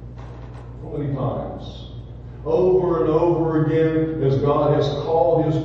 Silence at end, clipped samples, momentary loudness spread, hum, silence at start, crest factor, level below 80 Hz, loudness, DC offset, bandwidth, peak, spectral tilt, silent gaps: 0 s; under 0.1%; 19 LU; 60 Hz at -35 dBFS; 0 s; 16 dB; -40 dBFS; -20 LUFS; under 0.1%; 7 kHz; -6 dBFS; -9 dB/octave; none